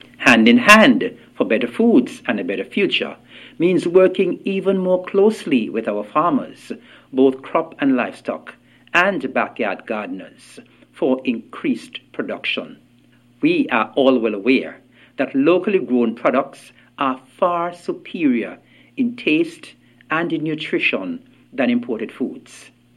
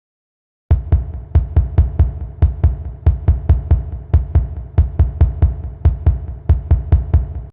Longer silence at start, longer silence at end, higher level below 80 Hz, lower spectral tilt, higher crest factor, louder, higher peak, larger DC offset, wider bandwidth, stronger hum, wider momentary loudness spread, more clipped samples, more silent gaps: second, 0.2 s vs 0.7 s; first, 0.35 s vs 0 s; second, -62 dBFS vs -18 dBFS; second, -5 dB/octave vs -12.5 dB/octave; about the same, 18 dB vs 14 dB; about the same, -18 LUFS vs -18 LUFS; about the same, 0 dBFS vs -2 dBFS; neither; first, 15 kHz vs 3.1 kHz; neither; first, 14 LU vs 4 LU; neither; neither